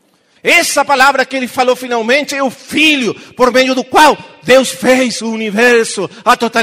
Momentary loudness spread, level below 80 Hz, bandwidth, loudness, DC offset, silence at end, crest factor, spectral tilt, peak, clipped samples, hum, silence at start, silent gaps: 8 LU; -50 dBFS; 16.5 kHz; -11 LUFS; under 0.1%; 0 s; 12 dB; -2.5 dB/octave; 0 dBFS; 0.3%; none; 0.45 s; none